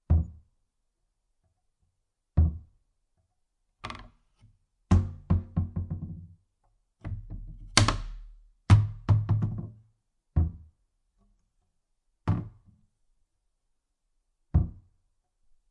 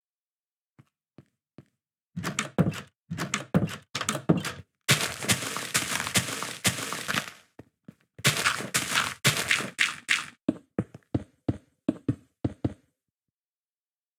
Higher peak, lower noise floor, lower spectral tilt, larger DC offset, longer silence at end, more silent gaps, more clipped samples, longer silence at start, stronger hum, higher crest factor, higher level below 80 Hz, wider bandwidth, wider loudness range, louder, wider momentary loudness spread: first, 0 dBFS vs -6 dBFS; second, -78 dBFS vs under -90 dBFS; first, -5 dB/octave vs -3 dB/octave; neither; second, 1 s vs 1.45 s; second, none vs 2.03-2.10 s, 2.96-3.01 s, 10.44-10.48 s; neither; second, 0.1 s vs 1.2 s; neither; about the same, 30 dB vs 26 dB; first, -40 dBFS vs -60 dBFS; second, 11.5 kHz vs over 20 kHz; about the same, 10 LU vs 8 LU; about the same, -28 LUFS vs -28 LUFS; first, 22 LU vs 11 LU